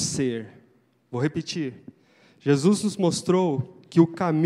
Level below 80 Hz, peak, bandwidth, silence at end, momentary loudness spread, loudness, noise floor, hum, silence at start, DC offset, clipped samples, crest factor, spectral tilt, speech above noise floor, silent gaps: -64 dBFS; -6 dBFS; 13.5 kHz; 0 s; 13 LU; -24 LUFS; -61 dBFS; none; 0 s; under 0.1%; under 0.1%; 20 dB; -6 dB/octave; 39 dB; none